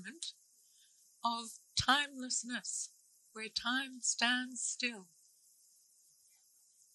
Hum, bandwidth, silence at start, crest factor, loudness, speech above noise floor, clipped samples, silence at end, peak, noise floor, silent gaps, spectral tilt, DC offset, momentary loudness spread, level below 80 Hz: none; 12 kHz; 0 s; 26 dB; -36 LUFS; 32 dB; under 0.1%; 1.9 s; -14 dBFS; -69 dBFS; none; -0.5 dB/octave; under 0.1%; 15 LU; -68 dBFS